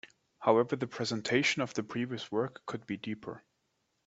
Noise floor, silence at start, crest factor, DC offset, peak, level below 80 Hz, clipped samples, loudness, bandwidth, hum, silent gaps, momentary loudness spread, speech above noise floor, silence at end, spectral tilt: -79 dBFS; 0.05 s; 22 dB; under 0.1%; -12 dBFS; -74 dBFS; under 0.1%; -33 LUFS; 8.2 kHz; none; none; 14 LU; 46 dB; 0.65 s; -4.5 dB/octave